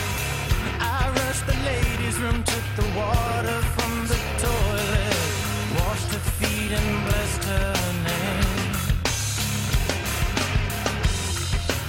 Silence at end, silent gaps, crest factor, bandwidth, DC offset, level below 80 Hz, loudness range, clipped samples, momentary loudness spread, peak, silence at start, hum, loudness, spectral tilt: 0 s; none; 16 dB; 17 kHz; under 0.1%; -30 dBFS; 0 LU; under 0.1%; 2 LU; -8 dBFS; 0 s; none; -24 LUFS; -4 dB/octave